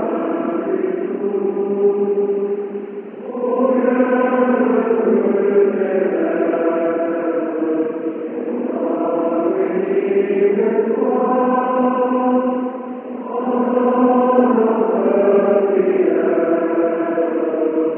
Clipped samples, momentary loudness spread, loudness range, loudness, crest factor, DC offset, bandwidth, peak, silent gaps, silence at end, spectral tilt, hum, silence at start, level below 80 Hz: under 0.1%; 8 LU; 4 LU; -17 LUFS; 16 dB; under 0.1%; 3.3 kHz; 0 dBFS; none; 0 s; -11.5 dB/octave; none; 0 s; -70 dBFS